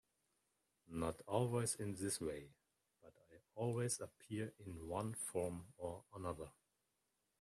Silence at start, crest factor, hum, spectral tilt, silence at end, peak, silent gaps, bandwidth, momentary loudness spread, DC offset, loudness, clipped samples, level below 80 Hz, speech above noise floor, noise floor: 0.9 s; 22 dB; none; -5 dB/octave; 0.9 s; -24 dBFS; none; 14 kHz; 12 LU; under 0.1%; -44 LUFS; under 0.1%; -72 dBFS; 42 dB; -86 dBFS